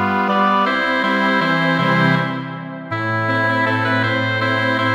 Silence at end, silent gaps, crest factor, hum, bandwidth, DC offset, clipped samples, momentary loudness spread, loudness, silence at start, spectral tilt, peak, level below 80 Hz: 0 s; none; 12 dB; none; 16.5 kHz; under 0.1%; under 0.1%; 8 LU; -17 LUFS; 0 s; -6.5 dB/octave; -4 dBFS; -66 dBFS